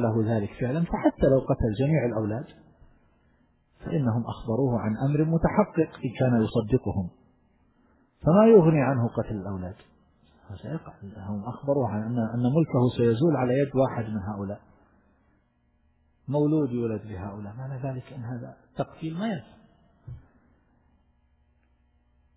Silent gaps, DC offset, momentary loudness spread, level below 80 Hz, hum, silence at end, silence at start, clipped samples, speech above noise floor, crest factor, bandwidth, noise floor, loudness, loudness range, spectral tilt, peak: none; under 0.1%; 15 LU; -48 dBFS; none; 2.15 s; 0 s; under 0.1%; 42 dB; 20 dB; 4 kHz; -67 dBFS; -26 LUFS; 12 LU; -12.5 dB/octave; -6 dBFS